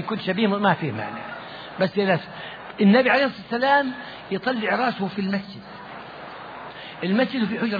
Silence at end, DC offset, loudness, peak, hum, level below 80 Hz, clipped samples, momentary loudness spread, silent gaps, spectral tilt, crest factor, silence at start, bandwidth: 0 s; under 0.1%; -22 LUFS; -6 dBFS; none; -64 dBFS; under 0.1%; 18 LU; none; -8 dB/octave; 18 dB; 0 s; 5 kHz